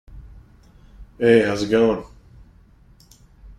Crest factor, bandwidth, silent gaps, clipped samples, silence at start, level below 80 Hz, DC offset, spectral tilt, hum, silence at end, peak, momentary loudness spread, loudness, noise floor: 20 dB; 11 kHz; none; under 0.1%; 0.1 s; -46 dBFS; under 0.1%; -6 dB/octave; none; 0.05 s; -2 dBFS; 6 LU; -18 LUFS; -51 dBFS